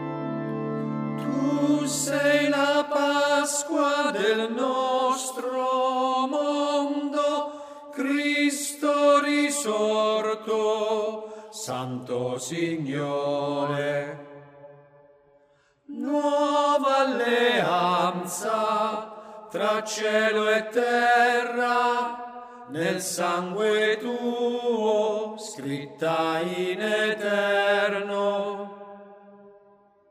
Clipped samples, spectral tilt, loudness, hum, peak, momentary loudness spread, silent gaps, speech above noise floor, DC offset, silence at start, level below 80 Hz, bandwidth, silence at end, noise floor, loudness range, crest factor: under 0.1%; -3.5 dB/octave; -25 LUFS; none; -8 dBFS; 11 LU; none; 38 dB; under 0.1%; 0 s; -76 dBFS; 15.5 kHz; 0.6 s; -63 dBFS; 5 LU; 16 dB